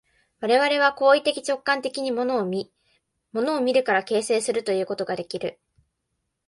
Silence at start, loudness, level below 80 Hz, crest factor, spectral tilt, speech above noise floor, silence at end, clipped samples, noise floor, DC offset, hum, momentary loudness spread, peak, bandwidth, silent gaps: 0.4 s; -23 LUFS; -70 dBFS; 18 dB; -3.5 dB/octave; 55 dB; 0.95 s; under 0.1%; -78 dBFS; under 0.1%; none; 12 LU; -6 dBFS; 11.5 kHz; none